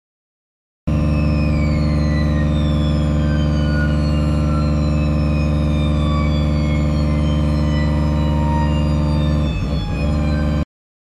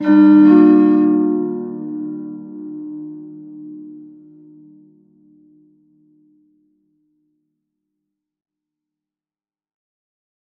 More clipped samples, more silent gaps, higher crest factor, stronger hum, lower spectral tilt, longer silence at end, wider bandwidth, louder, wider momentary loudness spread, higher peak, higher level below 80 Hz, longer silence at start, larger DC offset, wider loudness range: neither; neither; second, 10 dB vs 18 dB; neither; second, -8 dB/octave vs -10.5 dB/octave; second, 0.45 s vs 6.6 s; first, 9.8 kHz vs 4.2 kHz; second, -18 LUFS vs -13 LUFS; second, 2 LU vs 27 LU; second, -6 dBFS vs 0 dBFS; first, -22 dBFS vs -76 dBFS; first, 0.85 s vs 0 s; neither; second, 1 LU vs 27 LU